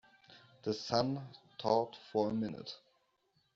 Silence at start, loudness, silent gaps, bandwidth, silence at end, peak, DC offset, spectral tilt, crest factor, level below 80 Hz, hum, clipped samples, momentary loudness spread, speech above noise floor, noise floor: 0.3 s; -36 LUFS; none; 7.6 kHz; 0.8 s; -14 dBFS; under 0.1%; -5 dB/octave; 22 dB; -74 dBFS; none; under 0.1%; 15 LU; 41 dB; -77 dBFS